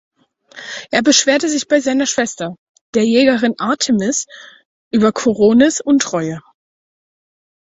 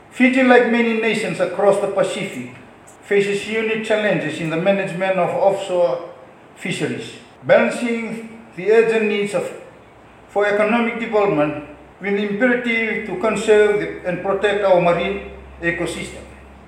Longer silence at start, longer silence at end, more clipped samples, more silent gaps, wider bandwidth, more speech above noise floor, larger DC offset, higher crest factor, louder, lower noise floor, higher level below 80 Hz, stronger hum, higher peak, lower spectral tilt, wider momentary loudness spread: first, 0.55 s vs 0.1 s; first, 1.25 s vs 0.05 s; neither; first, 2.58-2.74 s, 2.81-2.93 s, 4.65-4.91 s vs none; second, 8.2 kHz vs 12 kHz; about the same, 27 dB vs 27 dB; neither; about the same, 16 dB vs 18 dB; first, -15 LUFS vs -18 LUFS; second, -41 dBFS vs -45 dBFS; second, -56 dBFS vs -50 dBFS; neither; about the same, 0 dBFS vs 0 dBFS; second, -3.5 dB/octave vs -5.5 dB/octave; about the same, 15 LU vs 15 LU